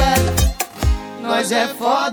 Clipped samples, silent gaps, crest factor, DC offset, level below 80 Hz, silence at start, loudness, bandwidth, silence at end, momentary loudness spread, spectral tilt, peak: under 0.1%; none; 16 dB; under 0.1%; -24 dBFS; 0 s; -19 LUFS; over 20 kHz; 0 s; 6 LU; -4 dB/octave; -2 dBFS